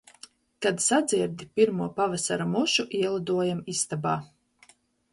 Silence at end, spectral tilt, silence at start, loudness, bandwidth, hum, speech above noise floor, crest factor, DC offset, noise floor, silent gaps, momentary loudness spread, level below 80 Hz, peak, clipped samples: 0.9 s; -3.5 dB/octave; 0.6 s; -26 LUFS; 11.5 kHz; none; 34 dB; 18 dB; under 0.1%; -60 dBFS; none; 6 LU; -66 dBFS; -10 dBFS; under 0.1%